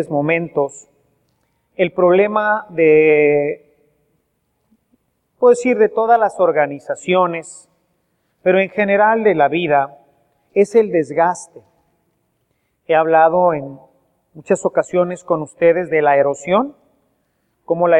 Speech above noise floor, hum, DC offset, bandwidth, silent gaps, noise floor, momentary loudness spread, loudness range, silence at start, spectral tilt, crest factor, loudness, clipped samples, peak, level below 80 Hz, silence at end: 52 dB; none; under 0.1%; 10 kHz; none; -67 dBFS; 11 LU; 2 LU; 0 s; -6 dB/octave; 16 dB; -16 LUFS; under 0.1%; 0 dBFS; -64 dBFS; 0 s